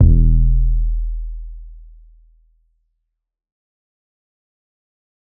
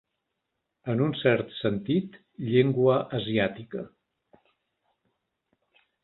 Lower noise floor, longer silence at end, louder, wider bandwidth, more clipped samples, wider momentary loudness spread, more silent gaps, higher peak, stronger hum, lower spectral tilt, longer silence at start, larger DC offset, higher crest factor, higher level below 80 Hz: second, -77 dBFS vs -82 dBFS; first, 3.6 s vs 2.15 s; first, -19 LUFS vs -26 LUFS; second, 0.7 kHz vs 4.3 kHz; neither; first, 22 LU vs 16 LU; neither; first, 0 dBFS vs -8 dBFS; neither; first, -18 dB/octave vs -11 dB/octave; second, 0 s vs 0.85 s; neither; about the same, 18 dB vs 20 dB; first, -20 dBFS vs -64 dBFS